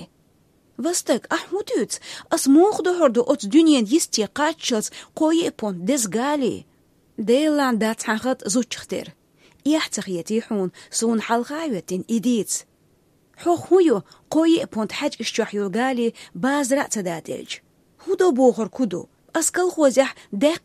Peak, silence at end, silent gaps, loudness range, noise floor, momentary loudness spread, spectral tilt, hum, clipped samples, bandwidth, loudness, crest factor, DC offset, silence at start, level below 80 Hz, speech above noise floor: -4 dBFS; 0.05 s; none; 6 LU; -60 dBFS; 11 LU; -3.5 dB/octave; none; under 0.1%; 15 kHz; -21 LUFS; 18 dB; under 0.1%; 0 s; -66 dBFS; 39 dB